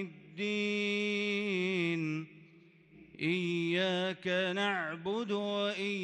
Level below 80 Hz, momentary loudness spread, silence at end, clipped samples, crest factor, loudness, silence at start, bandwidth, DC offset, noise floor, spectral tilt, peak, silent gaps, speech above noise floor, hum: -80 dBFS; 6 LU; 0 s; under 0.1%; 14 dB; -33 LUFS; 0 s; 10 kHz; under 0.1%; -60 dBFS; -5.5 dB/octave; -20 dBFS; none; 27 dB; none